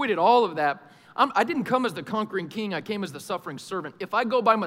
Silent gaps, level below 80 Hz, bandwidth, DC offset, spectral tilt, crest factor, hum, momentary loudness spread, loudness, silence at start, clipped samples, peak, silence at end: none; -76 dBFS; 16 kHz; under 0.1%; -5 dB/octave; 20 dB; none; 13 LU; -25 LUFS; 0 s; under 0.1%; -6 dBFS; 0 s